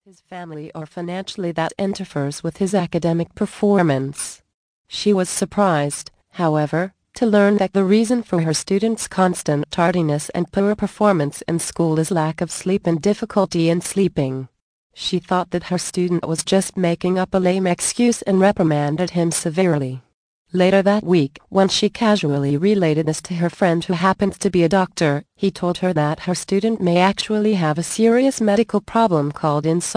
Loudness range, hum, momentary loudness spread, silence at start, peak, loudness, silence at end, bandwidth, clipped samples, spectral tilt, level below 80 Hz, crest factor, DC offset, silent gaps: 3 LU; none; 9 LU; 0.3 s; -2 dBFS; -19 LUFS; 0 s; 10.5 kHz; under 0.1%; -5.5 dB/octave; -52 dBFS; 18 dB; under 0.1%; 4.54-4.85 s, 14.62-14.90 s, 20.14-20.45 s